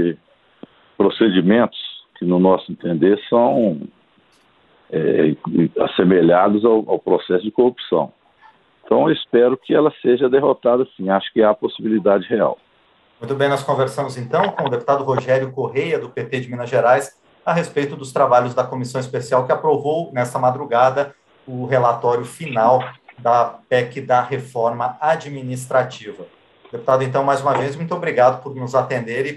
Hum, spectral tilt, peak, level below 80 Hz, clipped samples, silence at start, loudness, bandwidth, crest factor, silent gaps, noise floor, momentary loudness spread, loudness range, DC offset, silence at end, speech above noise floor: none; -6.5 dB/octave; -2 dBFS; -62 dBFS; under 0.1%; 0 s; -18 LUFS; 12.5 kHz; 16 dB; none; -56 dBFS; 10 LU; 3 LU; under 0.1%; 0 s; 39 dB